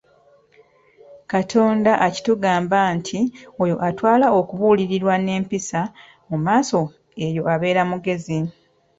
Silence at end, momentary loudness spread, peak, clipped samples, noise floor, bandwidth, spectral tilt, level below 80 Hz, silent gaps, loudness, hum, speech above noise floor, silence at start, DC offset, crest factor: 0.5 s; 9 LU; -4 dBFS; under 0.1%; -55 dBFS; 8 kHz; -6 dB/octave; -58 dBFS; none; -20 LUFS; none; 36 dB; 1.1 s; under 0.1%; 16 dB